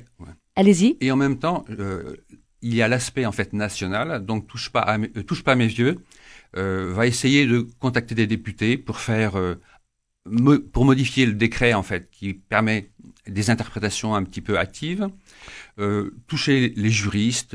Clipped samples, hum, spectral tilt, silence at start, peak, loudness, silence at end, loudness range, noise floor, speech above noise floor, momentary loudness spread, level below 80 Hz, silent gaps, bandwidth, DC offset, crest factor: under 0.1%; none; -5.5 dB/octave; 0.2 s; -2 dBFS; -22 LUFS; 0.1 s; 4 LU; -63 dBFS; 42 dB; 12 LU; -44 dBFS; none; 11 kHz; under 0.1%; 20 dB